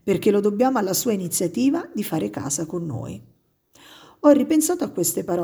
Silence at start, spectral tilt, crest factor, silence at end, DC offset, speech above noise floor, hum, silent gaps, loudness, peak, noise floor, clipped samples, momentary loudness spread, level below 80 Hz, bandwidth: 0.05 s; -5 dB/octave; 18 dB; 0 s; under 0.1%; 36 dB; none; none; -21 LUFS; -4 dBFS; -57 dBFS; under 0.1%; 11 LU; -60 dBFS; over 20 kHz